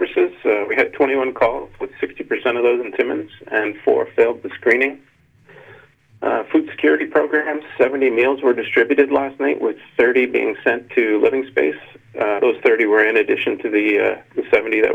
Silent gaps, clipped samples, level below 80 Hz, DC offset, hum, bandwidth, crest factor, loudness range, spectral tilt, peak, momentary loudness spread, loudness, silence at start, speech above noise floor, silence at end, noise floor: none; under 0.1%; -58 dBFS; under 0.1%; none; 4.9 kHz; 16 dB; 3 LU; -6 dB/octave; -2 dBFS; 7 LU; -18 LUFS; 0 s; 33 dB; 0 s; -50 dBFS